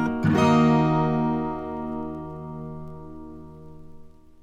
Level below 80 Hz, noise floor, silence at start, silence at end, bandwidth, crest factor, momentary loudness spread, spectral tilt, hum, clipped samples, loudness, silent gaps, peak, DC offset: -48 dBFS; -45 dBFS; 0 s; 0.35 s; 8.6 kHz; 18 dB; 23 LU; -7.5 dB/octave; none; under 0.1%; -23 LUFS; none; -8 dBFS; under 0.1%